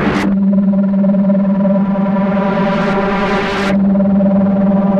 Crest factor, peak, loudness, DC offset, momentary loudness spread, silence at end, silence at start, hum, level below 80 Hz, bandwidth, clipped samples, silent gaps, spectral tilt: 8 dB; -4 dBFS; -13 LUFS; under 0.1%; 3 LU; 0 s; 0 s; none; -36 dBFS; 7 kHz; under 0.1%; none; -8.5 dB/octave